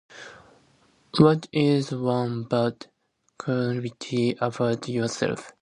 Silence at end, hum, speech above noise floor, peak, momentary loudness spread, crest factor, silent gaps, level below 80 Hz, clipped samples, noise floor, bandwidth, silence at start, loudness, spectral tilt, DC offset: 0.1 s; none; 37 dB; -4 dBFS; 14 LU; 22 dB; none; -62 dBFS; under 0.1%; -61 dBFS; 10.5 kHz; 0.1 s; -25 LUFS; -6.5 dB/octave; under 0.1%